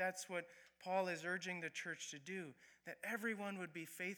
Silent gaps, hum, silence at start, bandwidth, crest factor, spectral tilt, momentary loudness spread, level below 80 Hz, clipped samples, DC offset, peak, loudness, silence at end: none; none; 0 s; over 20 kHz; 18 dB; -3.5 dB/octave; 13 LU; under -90 dBFS; under 0.1%; under 0.1%; -28 dBFS; -45 LUFS; 0 s